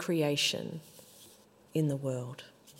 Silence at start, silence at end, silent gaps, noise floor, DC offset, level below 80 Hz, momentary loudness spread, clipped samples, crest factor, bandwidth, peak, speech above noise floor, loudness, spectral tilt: 0 s; 0 s; none; -59 dBFS; under 0.1%; -78 dBFS; 24 LU; under 0.1%; 20 dB; 16 kHz; -16 dBFS; 27 dB; -32 LUFS; -4.5 dB/octave